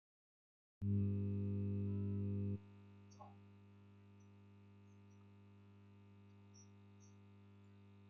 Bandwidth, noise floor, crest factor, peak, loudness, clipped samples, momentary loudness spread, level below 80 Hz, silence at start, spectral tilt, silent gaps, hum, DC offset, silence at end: 6.4 kHz; -64 dBFS; 16 dB; -30 dBFS; -43 LUFS; under 0.1%; 23 LU; -78 dBFS; 0.8 s; -10 dB/octave; none; 50 Hz at -55 dBFS; under 0.1%; 0 s